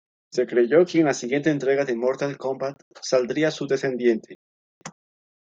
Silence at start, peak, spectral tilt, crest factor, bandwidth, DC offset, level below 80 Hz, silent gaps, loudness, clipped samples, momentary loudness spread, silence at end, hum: 0.35 s; -6 dBFS; -5.5 dB/octave; 18 dB; 7.8 kHz; under 0.1%; -72 dBFS; 2.82-2.91 s, 4.35-4.81 s; -23 LUFS; under 0.1%; 15 LU; 0.65 s; none